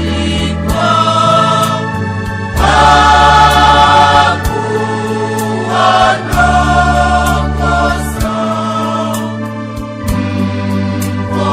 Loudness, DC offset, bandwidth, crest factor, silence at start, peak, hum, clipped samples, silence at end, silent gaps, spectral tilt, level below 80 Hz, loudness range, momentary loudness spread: -11 LUFS; under 0.1%; 16 kHz; 10 dB; 0 s; 0 dBFS; none; 0.7%; 0 s; none; -5 dB/octave; -22 dBFS; 7 LU; 11 LU